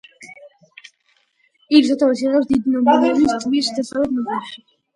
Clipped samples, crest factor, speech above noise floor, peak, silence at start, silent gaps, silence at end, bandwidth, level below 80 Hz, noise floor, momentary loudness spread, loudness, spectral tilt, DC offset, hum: under 0.1%; 18 dB; 46 dB; 0 dBFS; 0.2 s; none; 0.4 s; 11 kHz; -56 dBFS; -63 dBFS; 11 LU; -17 LUFS; -4.5 dB/octave; under 0.1%; none